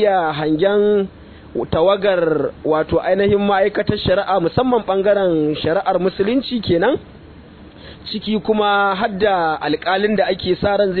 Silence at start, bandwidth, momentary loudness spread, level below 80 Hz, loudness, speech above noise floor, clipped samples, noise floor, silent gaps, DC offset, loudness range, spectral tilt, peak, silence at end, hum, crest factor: 0 s; 4.6 kHz; 5 LU; -44 dBFS; -17 LUFS; 23 dB; under 0.1%; -40 dBFS; none; under 0.1%; 3 LU; -9.5 dB/octave; -2 dBFS; 0 s; none; 14 dB